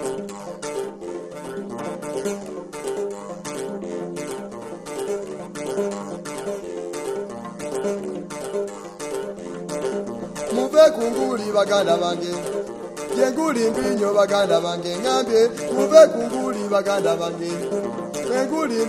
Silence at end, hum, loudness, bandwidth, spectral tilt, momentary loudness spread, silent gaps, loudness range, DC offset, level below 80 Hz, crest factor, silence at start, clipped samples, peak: 0 s; none; -23 LUFS; 14 kHz; -4.5 dB/octave; 14 LU; none; 12 LU; under 0.1%; -58 dBFS; 22 dB; 0 s; under 0.1%; 0 dBFS